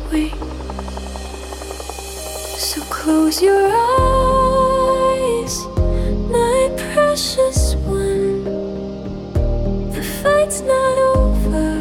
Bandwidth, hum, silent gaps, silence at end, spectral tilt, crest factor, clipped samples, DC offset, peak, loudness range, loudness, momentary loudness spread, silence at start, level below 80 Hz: 18 kHz; none; none; 0 s; -5 dB/octave; 12 dB; under 0.1%; under 0.1%; -4 dBFS; 4 LU; -17 LUFS; 14 LU; 0 s; -24 dBFS